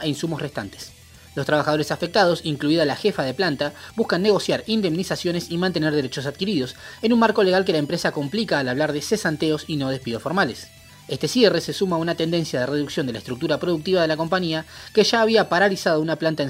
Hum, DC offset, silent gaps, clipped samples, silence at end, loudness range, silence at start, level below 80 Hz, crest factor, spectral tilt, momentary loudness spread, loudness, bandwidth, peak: none; under 0.1%; none; under 0.1%; 0 s; 2 LU; 0 s; -58 dBFS; 18 dB; -5 dB/octave; 10 LU; -22 LUFS; 16 kHz; -4 dBFS